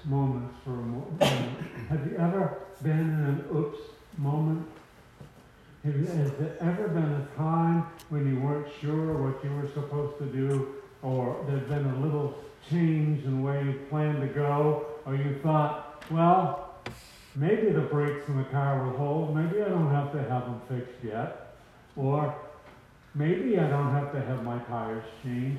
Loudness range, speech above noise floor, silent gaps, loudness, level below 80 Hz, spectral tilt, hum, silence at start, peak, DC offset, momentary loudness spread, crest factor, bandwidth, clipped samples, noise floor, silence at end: 4 LU; 26 dB; none; -29 LUFS; -60 dBFS; -8 dB/octave; none; 0 s; -8 dBFS; under 0.1%; 10 LU; 20 dB; 13 kHz; under 0.1%; -54 dBFS; 0 s